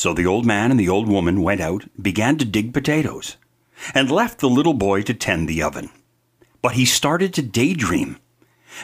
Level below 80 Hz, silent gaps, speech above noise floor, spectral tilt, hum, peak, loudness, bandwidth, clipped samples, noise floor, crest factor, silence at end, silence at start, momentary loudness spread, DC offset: -44 dBFS; none; 40 dB; -4.5 dB/octave; none; 0 dBFS; -19 LUFS; 16 kHz; under 0.1%; -59 dBFS; 20 dB; 0 s; 0 s; 9 LU; under 0.1%